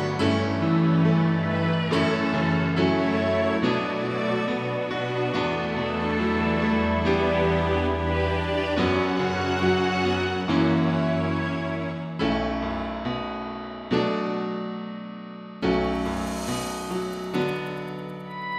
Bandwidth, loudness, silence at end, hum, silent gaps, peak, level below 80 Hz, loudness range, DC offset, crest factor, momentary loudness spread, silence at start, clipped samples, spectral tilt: 12.5 kHz; -25 LUFS; 0 s; none; none; -10 dBFS; -42 dBFS; 6 LU; under 0.1%; 16 dB; 9 LU; 0 s; under 0.1%; -6.5 dB/octave